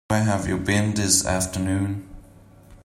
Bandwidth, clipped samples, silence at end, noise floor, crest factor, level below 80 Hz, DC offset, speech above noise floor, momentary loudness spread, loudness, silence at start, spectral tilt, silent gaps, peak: 16 kHz; under 0.1%; 0.1 s; -49 dBFS; 20 dB; -46 dBFS; under 0.1%; 27 dB; 7 LU; -22 LUFS; 0.1 s; -4 dB/octave; none; -4 dBFS